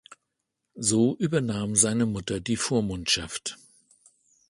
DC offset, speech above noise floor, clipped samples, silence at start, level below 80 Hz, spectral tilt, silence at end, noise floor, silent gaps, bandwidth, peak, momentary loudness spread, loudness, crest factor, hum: under 0.1%; 56 dB; under 0.1%; 0.1 s; -54 dBFS; -3.5 dB/octave; 0.95 s; -81 dBFS; none; 11.5 kHz; -6 dBFS; 9 LU; -25 LUFS; 20 dB; none